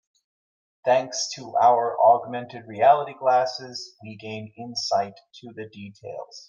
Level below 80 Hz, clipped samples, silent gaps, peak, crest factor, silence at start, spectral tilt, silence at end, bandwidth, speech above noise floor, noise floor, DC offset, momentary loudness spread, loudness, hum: -78 dBFS; under 0.1%; none; -4 dBFS; 20 dB; 0.85 s; -3.5 dB/octave; 0.1 s; 7.8 kHz; over 66 dB; under -90 dBFS; under 0.1%; 20 LU; -22 LUFS; none